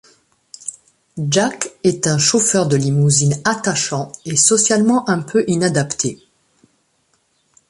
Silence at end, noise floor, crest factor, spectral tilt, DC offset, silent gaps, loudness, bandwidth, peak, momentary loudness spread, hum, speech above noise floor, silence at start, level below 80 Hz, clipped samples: 1.55 s; -63 dBFS; 16 dB; -4 dB/octave; under 0.1%; none; -16 LUFS; 11.5 kHz; -2 dBFS; 12 LU; none; 47 dB; 0.65 s; -56 dBFS; under 0.1%